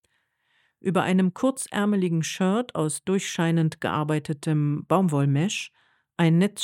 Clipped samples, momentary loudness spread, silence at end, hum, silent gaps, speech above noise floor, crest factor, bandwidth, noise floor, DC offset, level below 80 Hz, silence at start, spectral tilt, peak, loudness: under 0.1%; 6 LU; 0 s; none; none; 48 dB; 18 dB; 14 kHz; -71 dBFS; under 0.1%; -70 dBFS; 0.85 s; -6 dB/octave; -8 dBFS; -24 LUFS